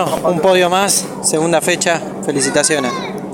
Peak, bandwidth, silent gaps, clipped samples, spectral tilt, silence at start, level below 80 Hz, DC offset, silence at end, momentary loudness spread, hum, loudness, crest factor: 0 dBFS; 19 kHz; none; under 0.1%; -3 dB/octave; 0 s; -54 dBFS; under 0.1%; 0 s; 7 LU; none; -14 LUFS; 16 dB